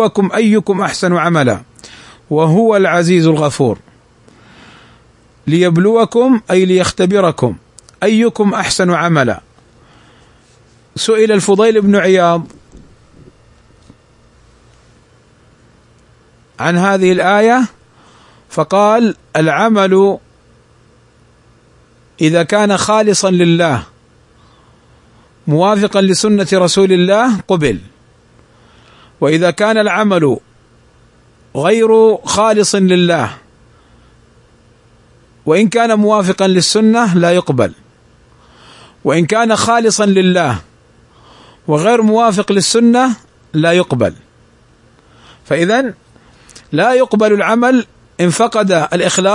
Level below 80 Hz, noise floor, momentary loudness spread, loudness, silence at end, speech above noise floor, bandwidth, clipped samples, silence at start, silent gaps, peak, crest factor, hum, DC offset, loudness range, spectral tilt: -50 dBFS; -48 dBFS; 9 LU; -12 LUFS; 0 s; 37 dB; 11 kHz; under 0.1%; 0 s; none; 0 dBFS; 14 dB; none; under 0.1%; 3 LU; -5 dB/octave